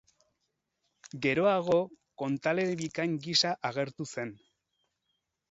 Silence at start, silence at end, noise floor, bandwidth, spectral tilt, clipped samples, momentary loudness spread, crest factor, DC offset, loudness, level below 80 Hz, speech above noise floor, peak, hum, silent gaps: 1.05 s; 1.15 s; -82 dBFS; 8.2 kHz; -4.5 dB/octave; under 0.1%; 12 LU; 20 dB; under 0.1%; -30 LUFS; -72 dBFS; 52 dB; -12 dBFS; none; none